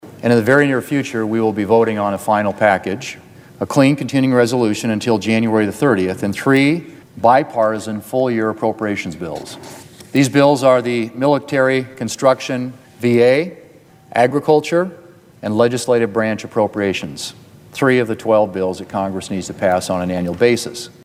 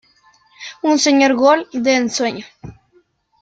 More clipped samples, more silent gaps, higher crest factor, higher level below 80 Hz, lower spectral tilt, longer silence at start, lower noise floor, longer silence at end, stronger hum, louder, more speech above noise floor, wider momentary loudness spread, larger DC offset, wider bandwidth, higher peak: neither; neither; about the same, 16 dB vs 16 dB; about the same, -56 dBFS vs -56 dBFS; first, -5.5 dB/octave vs -2.5 dB/octave; second, 0.05 s vs 0.6 s; second, -45 dBFS vs -57 dBFS; second, 0.15 s vs 0.7 s; neither; about the same, -16 LUFS vs -15 LUFS; second, 29 dB vs 43 dB; second, 12 LU vs 22 LU; neither; first, 16 kHz vs 9.2 kHz; about the same, 0 dBFS vs -2 dBFS